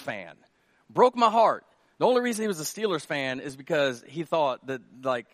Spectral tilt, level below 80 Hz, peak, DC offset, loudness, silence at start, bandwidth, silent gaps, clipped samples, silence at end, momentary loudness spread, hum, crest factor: -4 dB/octave; -76 dBFS; -6 dBFS; under 0.1%; -26 LUFS; 0 s; 15 kHz; none; under 0.1%; 0.1 s; 15 LU; none; 20 dB